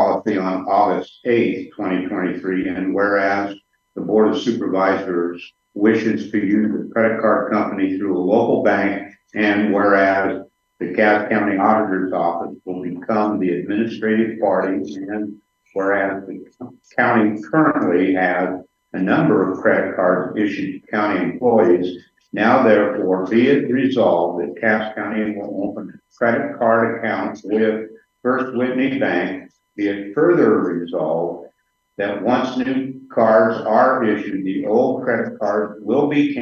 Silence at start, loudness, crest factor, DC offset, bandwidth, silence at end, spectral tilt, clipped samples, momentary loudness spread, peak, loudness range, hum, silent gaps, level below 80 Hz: 0 s; -18 LUFS; 18 dB; under 0.1%; 7 kHz; 0 s; -7.5 dB/octave; under 0.1%; 12 LU; 0 dBFS; 4 LU; none; none; -66 dBFS